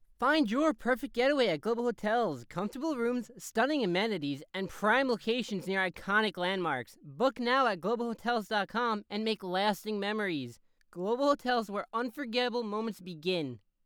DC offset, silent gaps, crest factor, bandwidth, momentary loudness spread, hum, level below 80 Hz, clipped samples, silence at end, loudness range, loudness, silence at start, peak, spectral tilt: under 0.1%; none; 18 dB; over 20 kHz; 9 LU; none; -66 dBFS; under 0.1%; 0.3 s; 3 LU; -31 LUFS; 0.2 s; -14 dBFS; -5 dB/octave